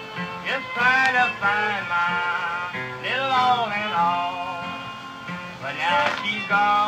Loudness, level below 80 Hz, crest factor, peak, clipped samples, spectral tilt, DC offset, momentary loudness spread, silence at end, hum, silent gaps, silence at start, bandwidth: -22 LUFS; -64 dBFS; 20 dB; -4 dBFS; under 0.1%; -3.5 dB/octave; under 0.1%; 12 LU; 0 s; none; none; 0 s; 15 kHz